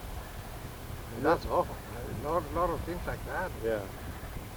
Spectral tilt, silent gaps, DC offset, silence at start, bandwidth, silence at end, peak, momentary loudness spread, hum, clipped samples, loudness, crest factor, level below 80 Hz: -6 dB/octave; none; under 0.1%; 0 s; over 20 kHz; 0 s; -14 dBFS; 13 LU; none; under 0.1%; -34 LUFS; 20 dB; -44 dBFS